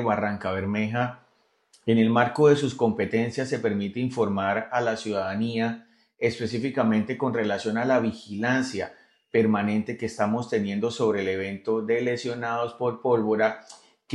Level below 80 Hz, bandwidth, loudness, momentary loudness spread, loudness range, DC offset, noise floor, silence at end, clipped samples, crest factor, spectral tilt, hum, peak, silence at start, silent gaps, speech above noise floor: -70 dBFS; 11 kHz; -26 LUFS; 7 LU; 3 LU; under 0.1%; -64 dBFS; 0 s; under 0.1%; 20 dB; -6.5 dB/octave; none; -6 dBFS; 0 s; none; 39 dB